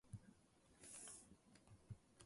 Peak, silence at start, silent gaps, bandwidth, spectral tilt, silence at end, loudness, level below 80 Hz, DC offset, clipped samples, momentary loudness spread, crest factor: -40 dBFS; 0.05 s; none; 11.5 kHz; -3.5 dB/octave; 0 s; -60 LUFS; -76 dBFS; under 0.1%; under 0.1%; 13 LU; 22 dB